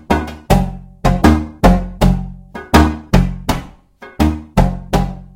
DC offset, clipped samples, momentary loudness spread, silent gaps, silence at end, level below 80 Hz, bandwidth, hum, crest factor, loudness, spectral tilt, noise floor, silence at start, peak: under 0.1%; 0.2%; 9 LU; none; 0.1 s; -20 dBFS; 17 kHz; none; 14 dB; -16 LUFS; -6.5 dB/octave; -39 dBFS; 0.1 s; 0 dBFS